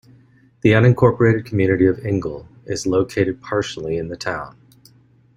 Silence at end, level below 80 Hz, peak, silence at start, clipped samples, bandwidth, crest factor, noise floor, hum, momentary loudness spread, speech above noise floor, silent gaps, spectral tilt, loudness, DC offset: 0.9 s; -48 dBFS; -2 dBFS; 0.65 s; under 0.1%; 11 kHz; 18 dB; -53 dBFS; none; 14 LU; 35 dB; none; -7 dB/octave; -19 LUFS; under 0.1%